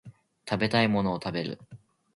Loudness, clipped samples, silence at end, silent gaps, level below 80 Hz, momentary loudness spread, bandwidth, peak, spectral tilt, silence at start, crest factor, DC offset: -28 LUFS; under 0.1%; 0.4 s; none; -58 dBFS; 17 LU; 11.5 kHz; -8 dBFS; -6.5 dB/octave; 0.05 s; 22 dB; under 0.1%